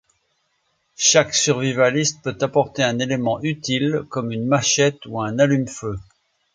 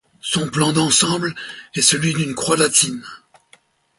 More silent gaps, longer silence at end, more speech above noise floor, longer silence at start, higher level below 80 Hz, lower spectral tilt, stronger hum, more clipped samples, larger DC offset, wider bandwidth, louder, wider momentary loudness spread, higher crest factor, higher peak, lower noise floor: neither; second, 0.5 s vs 0.85 s; first, 49 dB vs 36 dB; first, 1 s vs 0.25 s; about the same, -54 dBFS vs -56 dBFS; about the same, -3.5 dB/octave vs -3 dB/octave; neither; neither; neither; second, 10 kHz vs 12 kHz; about the same, -19 LUFS vs -17 LUFS; about the same, 11 LU vs 12 LU; about the same, 18 dB vs 20 dB; about the same, -2 dBFS vs 0 dBFS; first, -69 dBFS vs -55 dBFS